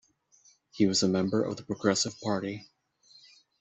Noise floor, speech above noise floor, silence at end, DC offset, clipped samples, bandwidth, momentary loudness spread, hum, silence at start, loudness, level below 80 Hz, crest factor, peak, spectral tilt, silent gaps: -64 dBFS; 35 dB; 0.95 s; under 0.1%; under 0.1%; 8.2 kHz; 8 LU; none; 0.75 s; -28 LUFS; -66 dBFS; 20 dB; -10 dBFS; -4.5 dB/octave; none